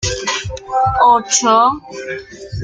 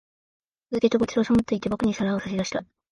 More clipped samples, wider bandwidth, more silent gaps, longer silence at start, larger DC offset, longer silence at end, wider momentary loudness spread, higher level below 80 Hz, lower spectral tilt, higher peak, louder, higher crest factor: neither; about the same, 10 kHz vs 10.5 kHz; neither; second, 0 s vs 0.7 s; neither; second, 0 s vs 0.3 s; first, 16 LU vs 8 LU; first, -38 dBFS vs -52 dBFS; second, -2.5 dB/octave vs -6 dB/octave; first, 0 dBFS vs -6 dBFS; first, -14 LUFS vs -25 LUFS; about the same, 14 dB vs 18 dB